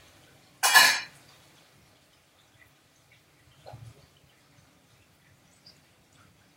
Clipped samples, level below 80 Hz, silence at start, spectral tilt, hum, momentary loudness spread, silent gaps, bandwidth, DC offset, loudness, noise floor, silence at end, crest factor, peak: under 0.1%; -72 dBFS; 0.65 s; 1 dB/octave; none; 31 LU; none; 16 kHz; under 0.1%; -20 LUFS; -62 dBFS; 2.8 s; 30 dB; -2 dBFS